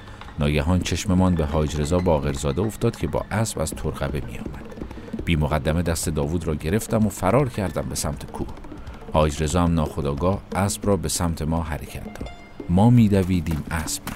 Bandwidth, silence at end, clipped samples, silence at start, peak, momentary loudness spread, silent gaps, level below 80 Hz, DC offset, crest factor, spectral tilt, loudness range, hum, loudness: 16 kHz; 0 s; under 0.1%; 0 s; -6 dBFS; 14 LU; none; -34 dBFS; under 0.1%; 18 dB; -6 dB/octave; 4 LU; none; -23 LUFS